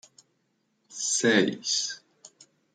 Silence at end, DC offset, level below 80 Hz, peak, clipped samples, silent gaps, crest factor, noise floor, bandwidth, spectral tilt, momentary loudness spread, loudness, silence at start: 0.45 s; under 0.1%; -78 dBFS; -8 dBFS; under 0.1%; none; 22 dB; -74 dBFS; 10 kHz; -2 dB/octave; 18 LU; -25 LUFS; 0.9 s